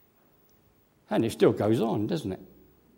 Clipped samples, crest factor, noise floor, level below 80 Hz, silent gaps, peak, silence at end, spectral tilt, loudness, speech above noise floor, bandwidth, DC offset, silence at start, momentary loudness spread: under 0.1%; 20 dB; -64 dBFS; -64 dBFS; none; -8 dBFS; 0.55 s; -7 dB/octave; -27 LUFS; 38 dB; 16.5 kHz; under 0.1%; 1.1 s; 12 LU